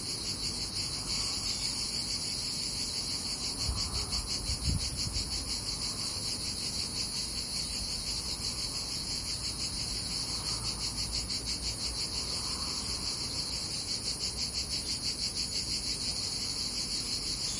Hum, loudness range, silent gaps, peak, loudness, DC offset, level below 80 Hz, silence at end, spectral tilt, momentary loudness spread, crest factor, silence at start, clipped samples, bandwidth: none; 1 LU; none; -18 dBFS; -32 LUFS; under 0.1%; -46 dBFS; 0 s; -1.5 dB/octave; 2 LU; 18 dB; 0 s; under 0.1%; 11.5 kHz